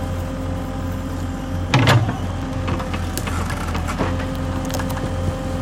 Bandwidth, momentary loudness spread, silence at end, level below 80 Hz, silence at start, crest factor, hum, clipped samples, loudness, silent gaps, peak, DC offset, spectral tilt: 17 kHz; 9 LU; 0 s; -32 dBFS; 0 s; 18 dB; none; under 0.1%; -22 LUFS; none; -2 dBFS; under 0.1%; -5.5 dB/octave